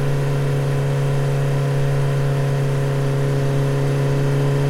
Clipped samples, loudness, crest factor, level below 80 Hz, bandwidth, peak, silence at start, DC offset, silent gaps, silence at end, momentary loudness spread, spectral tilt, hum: under 0.1%; -20 LUFS; 10 dB; -34 dBFS; 12.5 kHz; -8 dBFS; 0 s; under 0.1%; none; 0 s; 1 LU; -7.5 dB/octave; none